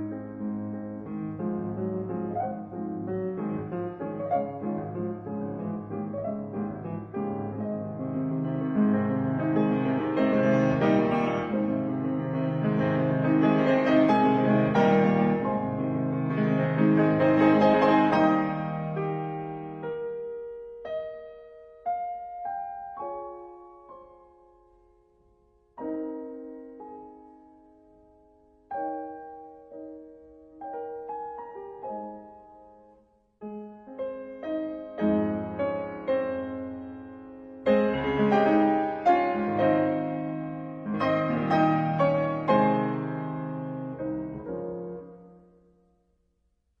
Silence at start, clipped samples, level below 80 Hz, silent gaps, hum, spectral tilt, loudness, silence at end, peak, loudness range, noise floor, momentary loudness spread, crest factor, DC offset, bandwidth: 0 s; under 0.1%; -60 dBFS; none; none; -9 dB/octave; -27 LUFS; 1.45 s; -10 dBFS; 18 LU; -72 dBFS; 18 LU; 18 dB; under 0.1%; 6.4 kHz